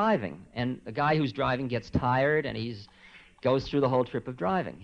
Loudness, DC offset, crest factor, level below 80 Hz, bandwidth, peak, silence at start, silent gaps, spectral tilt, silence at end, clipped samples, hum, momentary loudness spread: -29 LUFS; under 0.1%; 16 dB; -52 dBFS; 9 kHz; -14 dBFS; 0 s; none; -7.5 dB/octave; 0 s; under 0.1%; none; 9 LU